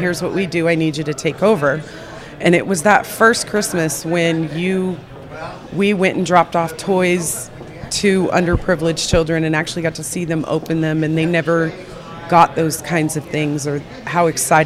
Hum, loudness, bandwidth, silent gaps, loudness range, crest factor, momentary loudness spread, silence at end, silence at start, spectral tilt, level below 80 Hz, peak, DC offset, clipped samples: none; -17 LUFS; 16 kHz; none; 2 LU; 18 dB; 12 LU; 0 s; 0 s; -5 dB/octave; -40 dBFS; 0 dBFS; under 0.1%; under 0.1%